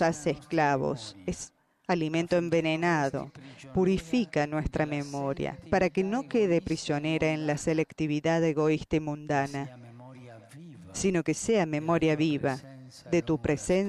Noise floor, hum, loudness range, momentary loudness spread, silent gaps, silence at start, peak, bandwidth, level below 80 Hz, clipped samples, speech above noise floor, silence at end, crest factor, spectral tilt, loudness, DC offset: -48 dBFS; none; 2 LU; 17 LU; none; 0 s; -12 dBFS; 12 kHz; -52 dBFS; under 0.1%; 20 dB; 0 s; 16 dB; -6 dB/octave; -29 LUFS; under 0.1%